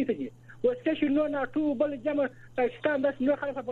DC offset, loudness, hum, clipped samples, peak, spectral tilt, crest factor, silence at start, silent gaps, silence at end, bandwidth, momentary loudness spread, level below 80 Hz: under 0.1%; -29 LUFS; none; under 0.1%; -14 dBFS; -7.5 dB/octave; 14 dB; 0 s; none; 0 s; 4.3 kHz; 5 LU; -62 dBFS